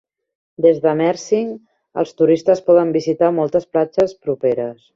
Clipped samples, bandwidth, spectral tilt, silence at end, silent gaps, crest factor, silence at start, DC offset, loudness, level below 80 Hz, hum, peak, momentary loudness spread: under 0.1%; 7.6 kHz; -7 dB/octave; 0.2 s; none; 16 dB; 0.6 s; under 0.1%; -17 LUFS; -60 dBFS; none; -2 dBFS; 10 LU